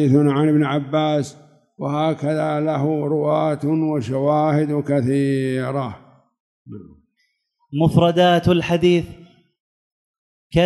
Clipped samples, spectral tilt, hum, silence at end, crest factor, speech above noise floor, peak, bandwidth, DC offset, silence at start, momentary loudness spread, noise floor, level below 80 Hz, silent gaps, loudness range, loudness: under 0.1%; -7.5 dB/octave; none; 0 s; 18 dB; 51 dB; -2 dBFS; 12 kHz; under 0.1%; 0 s; 14 LU; -69 dBFS; -50 dBFS; 6.40-6.65 s, 9.60-10.50 s; 3 LU; -19 LUFS